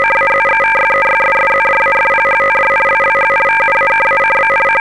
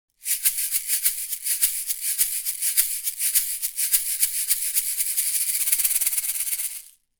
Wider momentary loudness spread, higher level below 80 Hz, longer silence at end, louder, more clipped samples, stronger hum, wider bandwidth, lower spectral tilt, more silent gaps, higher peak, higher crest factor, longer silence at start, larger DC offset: second, 0 LU vs 5 LU; first, -46 dBFS vs -60 dBFS; second, 0.15 s vs 0.3 s; first, -10 LUFS vs -21 LUFS; neither; neither; second, 11 kHz vs over 20 kHz; first, -3.5 dB/octave vs 6 dB/octave; neither; about the same, -4 dBFS vs -2 dBFS; second, 8 dB vs 24 dB; second, 0 s vs 0.2 s; first, 0.8% vs under 0.1%